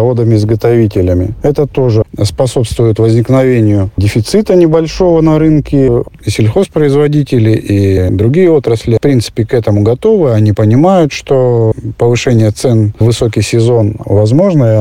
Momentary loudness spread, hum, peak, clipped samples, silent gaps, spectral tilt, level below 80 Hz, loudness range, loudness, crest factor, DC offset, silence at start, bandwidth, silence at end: 5 LU; none; 0 dBFS; under 0.1%; none; -7.5 dB/octave; -32 dBFS; 1 LU; -9 LUFS; 8 dB; under 0.1%; 0 s; 13.5 kHz; 0 s